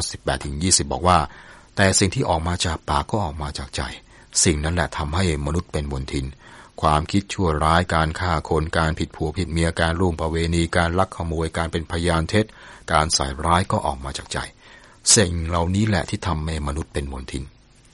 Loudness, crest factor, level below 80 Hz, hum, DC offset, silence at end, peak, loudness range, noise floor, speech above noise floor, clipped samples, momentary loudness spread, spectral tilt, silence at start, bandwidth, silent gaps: -22 LUFS; 20 dB; -34 dBFS; none; under 0.1%; 0.45 s; -2 dBFS; 3 LU; -47 dBFS; 25 dB; under 0.1%; 11 LU; -4 dB/octave; 0 s; 11.5 kHz; none